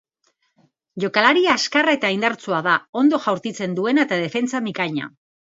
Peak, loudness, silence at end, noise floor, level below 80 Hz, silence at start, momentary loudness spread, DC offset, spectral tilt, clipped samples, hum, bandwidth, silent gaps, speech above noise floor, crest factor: -2 dBFS; -19 LUFS; 0.5 s; -68 dBFS; -68 dBFS; 0.95 s; 9 LU; under 0.1%; -4.5 dB/octave; under 0.1%; none; 7.8 kHz; 2.89-2.93 s; 48 dB; 20 dB